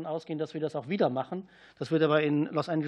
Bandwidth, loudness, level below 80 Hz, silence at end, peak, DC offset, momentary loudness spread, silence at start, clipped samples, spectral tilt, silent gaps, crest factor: 9.8 kHz; -29 LUFS; -76 dBFS; 0 s; -12 dBFS; under 0.1%; 12 LU; 0 s; under 0.1%; -7.5 dB/octave; none; 18 dB